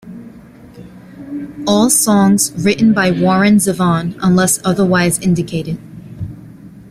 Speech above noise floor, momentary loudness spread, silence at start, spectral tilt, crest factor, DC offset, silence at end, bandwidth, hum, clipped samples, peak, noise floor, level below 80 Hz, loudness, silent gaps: 25 dB; 18 LU; 0.05 s; -4.5 dB/octave; 14 dB; under 0.1%; 0 s; 16 kHz; none; under 0.1%; 0 dBFS; -38 dBFS; -46 dBFS; -13 LUFS; none